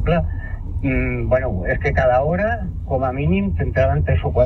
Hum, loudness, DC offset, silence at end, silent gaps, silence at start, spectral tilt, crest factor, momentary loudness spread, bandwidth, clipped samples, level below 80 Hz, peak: none; -20 LUFS; under 0.1%; 0 s; none; 0 s; -9.5 dB/octave; 14 dB; 8 LU; 6 kHz; under 0.1%; -26 dBFS; -4 dBFS